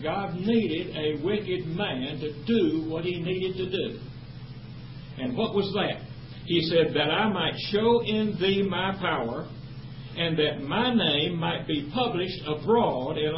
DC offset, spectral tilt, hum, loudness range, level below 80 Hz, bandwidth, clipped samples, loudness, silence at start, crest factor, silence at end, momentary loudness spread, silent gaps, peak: 0.2%; -10 dB/octave; none; 5 LU; -52 dBFS; 5.8 kHz; under 0.1%; -27 LUFS; 0 s; 16 dB; 0 s; 17 LU; none; -10 dBFS